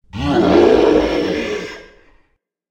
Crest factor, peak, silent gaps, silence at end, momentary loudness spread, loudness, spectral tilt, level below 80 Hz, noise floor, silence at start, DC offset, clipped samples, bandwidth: 16 dB; 0 dBFS; none; 0.9 s; 14 LU; -15 LUFS; -6.5 dB/octave; -36 dBFS; -63 dBFS; 0.15 s; under 0.1%; under 0.1%; 9.2 kHz